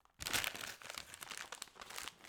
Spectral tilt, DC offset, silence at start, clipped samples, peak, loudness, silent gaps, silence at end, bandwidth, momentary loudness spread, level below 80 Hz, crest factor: -0.5 dB/octave; under 0.1%; 0.2 s; under 0.1%; -16 dBFS; -43 LUFS; none; 0 s; over 20 kHz; 11 LU; -68 dBFS; 30 dB